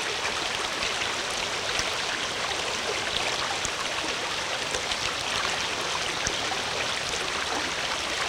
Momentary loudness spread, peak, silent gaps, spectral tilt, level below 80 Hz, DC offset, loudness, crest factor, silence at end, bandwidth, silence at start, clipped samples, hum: 1 LU; -6 dBFS; none; -1 dB/octave; -52 dBFS; under 0.1%; -27 LUFS; 22 dB; 0 s; 18 kHz; 0 s; under 0.1%; none